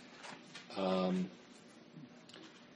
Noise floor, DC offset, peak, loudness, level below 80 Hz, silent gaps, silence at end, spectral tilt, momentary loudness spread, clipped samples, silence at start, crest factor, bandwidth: -58 dBFS; under 0.1%; -22 dBFS; -39 LUFS; -84 dBFS; none; 0 s; -6.5 dB/octave; 22 LU; under 0.1%; 0 s; 20 dB; 9.6 kHz